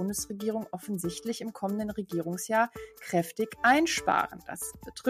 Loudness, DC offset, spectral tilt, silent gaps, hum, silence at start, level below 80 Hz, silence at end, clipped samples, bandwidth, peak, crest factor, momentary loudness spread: -30 LUFS; under 0.1%; -4 dB/octave; none; none; 0 s; -60 dBFS; 0 s; under 0.1%; 15.5 kHz; -10 dBFS; 20 dB; 12 LU